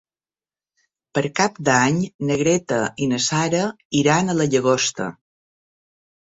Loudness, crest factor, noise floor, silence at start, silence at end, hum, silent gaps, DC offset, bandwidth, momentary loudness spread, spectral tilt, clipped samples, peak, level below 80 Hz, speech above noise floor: -20 LUFS; 18 dB; under -90 dBFS; 1.15 s; 1.1 s; none; 2.14-2.19 s, 3.85-3.90 s; under 0.1%; 8 kHz; 6 LU; -4.5 dB/octave; under 0.1%; -2 dBFS; -58 dBFS; over 70 dB